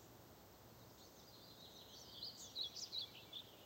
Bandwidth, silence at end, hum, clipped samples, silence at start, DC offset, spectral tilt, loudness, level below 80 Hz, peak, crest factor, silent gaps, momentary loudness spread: 16 kHz; 0 s; none; under 0.1%; 0 s; under 0.1%; -2 dB/octave; -51 LUFS; -78 dBFS; -36 dBFS; 20 dB; none; 16 LU